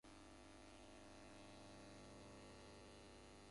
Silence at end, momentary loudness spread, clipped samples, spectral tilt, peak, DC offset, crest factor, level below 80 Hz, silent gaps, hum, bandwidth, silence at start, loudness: 0 s; 2 LU; under 0.1%; -4 dB/octave; -50 dBFS; under 0.1%; 12 dB; -70 dBFS; none; none; 11.5 kHz; 0.05 s; -62 LUFS